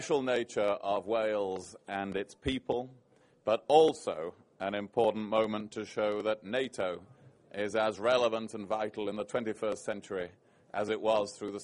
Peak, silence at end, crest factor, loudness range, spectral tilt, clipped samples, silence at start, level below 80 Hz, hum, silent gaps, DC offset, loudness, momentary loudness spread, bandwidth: -10 dBFS; 0 s; 22 dB; 3 LU; -4.5 dB/octave; under 0.1%; 0 s; -64 dBFS; none; none; under 0.1%; -32 LUFS; 11 LU; 11.5 kHz